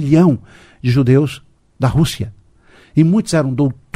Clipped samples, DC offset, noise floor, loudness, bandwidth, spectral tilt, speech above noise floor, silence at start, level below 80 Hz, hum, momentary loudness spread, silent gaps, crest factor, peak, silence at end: under 0.1%; under 0.1%; -48 dBFS; -15 LUFS; 15 kHz; -7 dB/octave; 34 dB; 0 s; -40 dBFS; none; 11 LU; none; 16 dB; 0 dBFS; 0.25 s